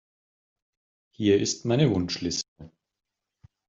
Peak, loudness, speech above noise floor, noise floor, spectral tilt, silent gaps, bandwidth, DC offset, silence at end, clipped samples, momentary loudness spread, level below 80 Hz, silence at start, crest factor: -8 dBFS; -25 LUFS; 36 dB; -60 dBFS; -5 dB/octave; 2.48-2.56 s; 7.8 kHz; under 0.1%; 1 s; under 0.1%; 8 LU; -62 dBFS; 1.2 s; 20 dB